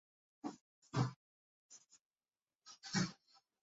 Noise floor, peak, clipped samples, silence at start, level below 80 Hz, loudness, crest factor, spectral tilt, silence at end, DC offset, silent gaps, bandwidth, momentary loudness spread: under -90 dBFS; -24 dBFS; under 0.1%; 0.45 s; -78 dBFS; -43 LUFS; 24 dB; -5 dB/octave; 0.5 s; under 0.1%; 0.61-0.82 s, 1.16-1.69 s, 2.01-2.11 s; 8 kHz; 23 LU